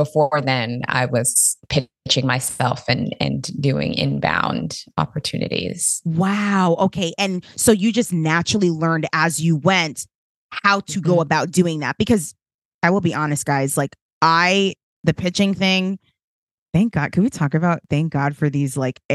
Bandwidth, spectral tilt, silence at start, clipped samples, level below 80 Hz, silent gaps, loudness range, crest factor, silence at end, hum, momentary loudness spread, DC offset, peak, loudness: 12.5 kHz; -4.5 dB/octave; 0 s; under 0.1%; -50 dBFS; 10.15-10.49 s, 12.54-12.79 s, 14.02-14.21 s, 14.83-15.04 s, 16.24-16.66 s, 19.05-19.09 s; 3 LU; 18 dB; 0 s; none; 7 LU; under 0.1%; 0 dBFS; -19 LUFS